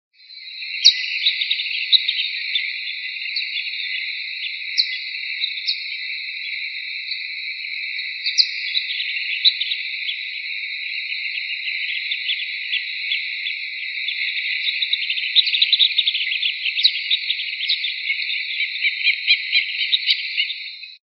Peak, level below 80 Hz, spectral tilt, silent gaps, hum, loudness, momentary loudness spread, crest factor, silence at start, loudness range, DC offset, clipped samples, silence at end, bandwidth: 0 dBFS; under -90 dBFS; 15.5 dB/octave; none; none; -20 LUFS; 10 LU; 22 dB; 0.2 s; 6 LU; under 0.1%; under 0.1%; 0.1 s; 6.2 kHz